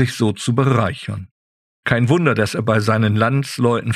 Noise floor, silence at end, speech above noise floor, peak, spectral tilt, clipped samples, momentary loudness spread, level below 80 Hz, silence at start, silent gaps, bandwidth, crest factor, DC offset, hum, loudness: under -90 dBFS; 0 s; over 73 dB; -2 dBFS; -6.5 dB/octave; under 0.1%; 11 LU; -50 dBFS; 0 s; 1.31-1.83 s; 13.5 kHz; 16 dB; under 0.1%; none; -18 LUFS